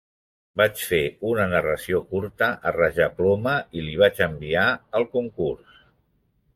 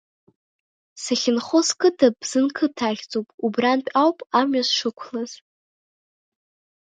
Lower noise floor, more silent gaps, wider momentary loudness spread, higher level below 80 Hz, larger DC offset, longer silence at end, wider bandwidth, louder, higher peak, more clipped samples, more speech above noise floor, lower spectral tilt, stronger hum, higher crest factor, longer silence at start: second, -67 dBFS vs under -90 dBFS; second, none vs 3.34-3.38 s; second, 8 LU vs 12 LU; first, -52 dBFS vs -72 dBFS; neither; second, 1 s vs 1.45 s; first, 16 kHz vs 9.6 kHz; about the same, -23 LUFS vs -21 LUFS; about the same, -4 dBFS vs -4 dBFS; neither; second, 44 dB vs over 69 dB; first, -5 dB/octave vs -3 dB/octave; neither; about the same, 18 dB vs 20 dB; second, 0.55 s vs 0.95 s